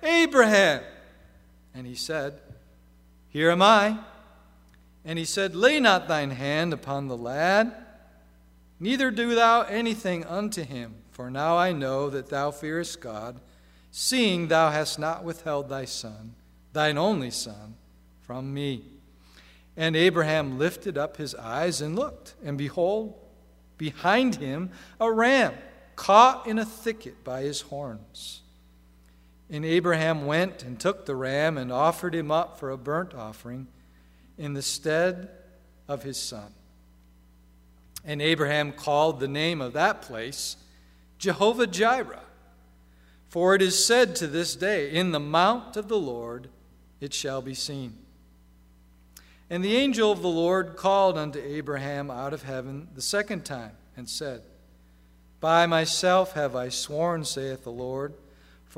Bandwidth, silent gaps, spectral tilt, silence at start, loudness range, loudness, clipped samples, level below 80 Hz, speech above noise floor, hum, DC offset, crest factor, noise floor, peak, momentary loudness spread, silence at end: 16 kHz; none; -4 dB/octave; 0 s; 8 LU; -25 LUFS; under 0.1%; -58 dBFS; 30 dB; 60 Hz at -55 dBFS; under 0.1%; 24 dB; -56 dBFS; -2 dBFS; 18 LU; 0.6 s